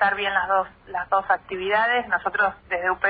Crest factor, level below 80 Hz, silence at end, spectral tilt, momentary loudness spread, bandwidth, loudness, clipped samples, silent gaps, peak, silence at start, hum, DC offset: 16 dB; -56 dBFS; 0 s; -6.5 dB/octave; 5 LU; 4.9 kHz; -23 LUFS; under 0.1%; none; -8 dBFS; 0 s; none; under 0.1%